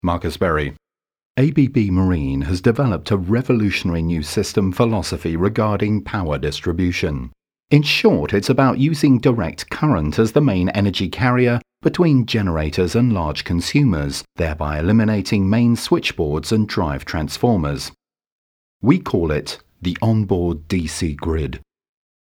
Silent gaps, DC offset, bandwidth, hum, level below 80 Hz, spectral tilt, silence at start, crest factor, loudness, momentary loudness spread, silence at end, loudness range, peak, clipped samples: 1.25-1.35 s, 18.27-18.80 s; under 0.1%; 16.5 kHz; none; -36 dBFS; -6.5 dB/octave; 0.05 s; 18 dB; -19 LUFS; 8 LU; 0.75 s; 4 LU; 0 dBFS; under 0.1%